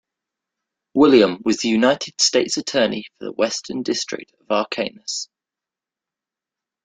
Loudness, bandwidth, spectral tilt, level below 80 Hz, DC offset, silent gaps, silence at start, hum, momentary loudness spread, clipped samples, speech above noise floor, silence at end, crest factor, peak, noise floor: -19 LUFS; 9.6 kHz; -3 dB/octave; -62 dBFS; under 0.1%; none; 0.95 s; none; 14 LU; under 0.1%; 69 dB; 1.6 s; 20 dB; -2 dBFS; -88 dBFS